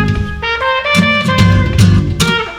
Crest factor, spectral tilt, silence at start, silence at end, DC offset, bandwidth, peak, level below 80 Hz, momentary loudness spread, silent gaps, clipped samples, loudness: 12 dB; -5.5 dB/octave; 0 s; 0 s; under 0.1%; 16 kHz; 0 dBFS; -24 dBFS; 6 LU; none; 0.2%; -11 LUFS